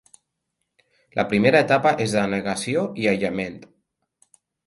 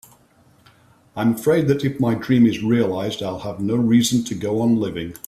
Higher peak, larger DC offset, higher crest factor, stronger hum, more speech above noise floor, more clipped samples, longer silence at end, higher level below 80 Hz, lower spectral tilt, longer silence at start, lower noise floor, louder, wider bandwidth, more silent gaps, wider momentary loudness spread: about the same, -2 dBFS vs -4 dBFS; neither; about the same, 20 dB vs 16 dB; neither; first, 57 dB vs 36 dB; neither; first, 1 s vs 0.1 s; about the same, -58 dBFS vs -54 dBFS; about the same, -5.5 dB/octave vs -6 dB/octave; about the same, 1.15 s vs 1.15 s; first, -78 dBFS vs -55 dBFS; about the same, -21 LUFS vs -20 LUFS; second, 11.5 kHz vs 14.5 kHz; neither; about the same, 11 LU vs 10 LU